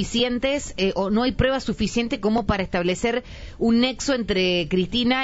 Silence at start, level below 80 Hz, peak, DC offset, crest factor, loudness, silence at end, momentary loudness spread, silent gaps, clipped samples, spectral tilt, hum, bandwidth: 0 s; -38 dBFS; -8 dBFS; under 0.1%; 16 dB; -22 LUFS; 0 s; 4 LU; none; under 0.1%; -5 dB/octave; none; 8 kHz